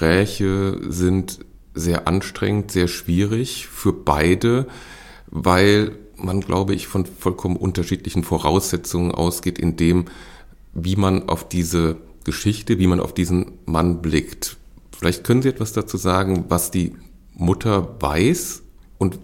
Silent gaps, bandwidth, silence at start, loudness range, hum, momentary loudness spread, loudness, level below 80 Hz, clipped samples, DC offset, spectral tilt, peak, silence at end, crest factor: none; 17 kHz; 0 s; 2 LU; none; 10 LU; -20 LUFS; -40 dBFS; under 0.1%; under 0.1%; -5.5 dB/octave; -2 dBFS; 0 s; 18 dB